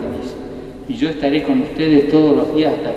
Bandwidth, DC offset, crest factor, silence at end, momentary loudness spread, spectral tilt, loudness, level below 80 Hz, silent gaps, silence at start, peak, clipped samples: 8 kHz; under 0.1%; 16 dB; 0 s; 17 LU; -7.5 dB/octave; -16 LUFS; -42 dBFS; none; 0 s; 0 dBFS; under 0.1%